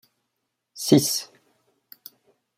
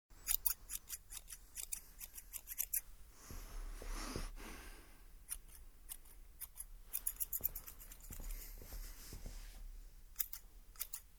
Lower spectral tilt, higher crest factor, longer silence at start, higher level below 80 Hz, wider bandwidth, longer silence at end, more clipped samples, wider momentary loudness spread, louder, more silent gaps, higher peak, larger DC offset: first, -4.5 dB/octave vs -1.5 dB/octave; second, 24 dB vs 32 dB; first, 0.75 s vs 0.1 s; second, -68 dBFS vs -54 dBFS; second, 16 kHz vs over 20 kHz; first, 1.35 s vs 0 s; neither; first, 26 LU vs 19 LU; first, -21 LUFS vs -44 LUFS; neither; first, -4 dBFS vs -16 dBFS; neither